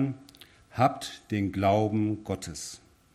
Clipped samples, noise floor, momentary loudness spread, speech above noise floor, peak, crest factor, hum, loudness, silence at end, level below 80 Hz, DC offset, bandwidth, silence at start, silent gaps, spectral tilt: under 0.1%; -54 dBFS; 16 LU; 26 dB; -10 dBFS; 20 dB; none; -29 LUFS; 0.35 s; -60 dBFS; under 0.1%; 14.5 kHz; 0 s; none; -6 dB/octave